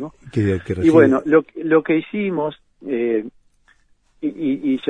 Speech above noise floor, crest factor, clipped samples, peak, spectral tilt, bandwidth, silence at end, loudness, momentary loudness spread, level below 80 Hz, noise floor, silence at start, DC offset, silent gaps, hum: 41 dB; 18 dB; under 0.1%; 0 dBFS; -8 dB/octave; 9.8 kHz; 0 s; -19 LUFS; 14 LU; -52 dBFS; -58 dBFS; 0 s; under 0.1%; none; none